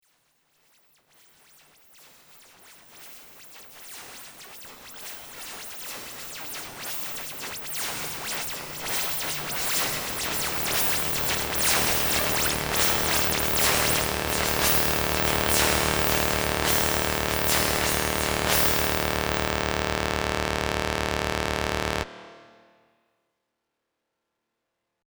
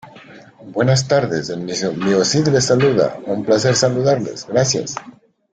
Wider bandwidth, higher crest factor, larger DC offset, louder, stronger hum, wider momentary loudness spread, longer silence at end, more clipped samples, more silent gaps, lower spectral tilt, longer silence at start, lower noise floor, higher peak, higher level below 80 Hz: first, over 20 kHz vs 9.4 kHz; first, 24 dB vs 16 dB; neither; second, -24 LUFS vs -17 LUFS; neither; first, 19 LU vs 9 LU; first, 2.65 s vs 0.45 s; neither; neither; second, -2.5 dB/octave vs -4.5 dB/octave; first, 2.3 s vs 0.05 s; first, -81 dBFS vs -41 dBFS; about the same, -4 dBFS vs -2 dBFS; first, -42 dBFS vs -52 dBFS